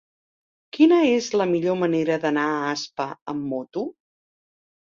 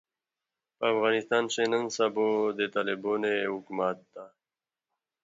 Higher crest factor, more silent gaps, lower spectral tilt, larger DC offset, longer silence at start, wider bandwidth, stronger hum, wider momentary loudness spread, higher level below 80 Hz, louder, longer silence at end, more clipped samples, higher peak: about the same, 18 dB vs 18 dB; first, 3.22-3.26 s vs none; first, -5.5 dB/octave vs -3.5 dB/octave; neither; about the same, 0.75 s vs 0.8 s; about the same, 7.4 kHz vs 7.8 kHz; neither; first, 14 LU vs 6 LU; first, -68 dBFS vs -80 dBFS; first, -22 LUFS vs -28 LUFS; about the same, 1.05 s vs 0.95 s; neither; first, -6 dBFS vs -12 dBFS